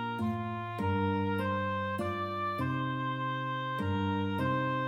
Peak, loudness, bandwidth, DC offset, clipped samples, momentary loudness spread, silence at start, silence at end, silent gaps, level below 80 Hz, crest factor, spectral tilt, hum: -20 dBFS; -33 LUFS; 15 kHz; under 0.1%; under 0.1%; 3 LU; 0 s; 0 s; none; -66 dBFS; 12 dB; -7.5 dB/octave; none